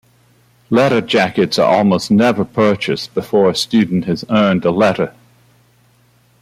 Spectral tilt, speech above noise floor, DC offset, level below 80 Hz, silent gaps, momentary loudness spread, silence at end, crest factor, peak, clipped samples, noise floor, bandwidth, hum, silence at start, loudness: -6 dB/octave; 40 dB; under 0.1%; -54 dBFS; none; 6 LU; 1.3 s; 14 dB; -2 dBFS; under 0.1%; -53 dBFS; 14.5 kHz; 60 Hz at -40 dBFS; 0.7 s; -14 LUFS